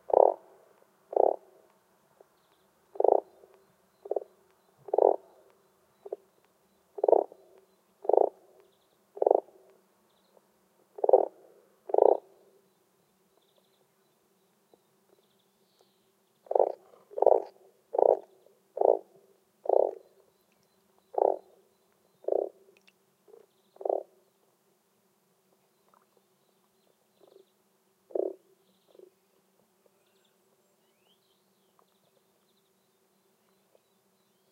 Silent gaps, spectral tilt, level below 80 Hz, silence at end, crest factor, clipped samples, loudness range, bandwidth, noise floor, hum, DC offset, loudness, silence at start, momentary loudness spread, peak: none; -6.5 dB/octave; -88 dBFS; 6.2 s; 30 dB; under 0.1%; 14 LU; 5 kHz; -71 dBFS; none; under 0.1%; -28 LUFS; 0.1 s; 20 LU; -4 dBFS